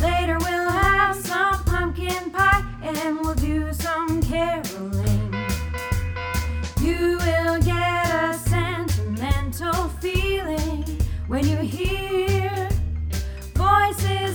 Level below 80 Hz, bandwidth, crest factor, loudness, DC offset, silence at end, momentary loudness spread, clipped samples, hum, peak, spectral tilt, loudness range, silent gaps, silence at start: -30 dBFS; over 20 kHz; 18 dB; -23 LUFS; under 0.1%; 0 s; 8 LU; under 0.1%; none; -4 dBFS; -5.5 dB/octave; 3 LU; none; 0 s